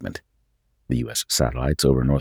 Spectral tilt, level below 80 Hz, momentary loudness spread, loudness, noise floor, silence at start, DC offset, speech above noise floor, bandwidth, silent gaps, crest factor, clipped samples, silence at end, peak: -5 dB/octave; -34 dBFS; 13 LU; -22 LUFS; -67 dBFS; 0 s; under 0.1%; 46 dB; 19.5 kHz; none; 18 dB; under 0.1%; 0 s; -4 dBFS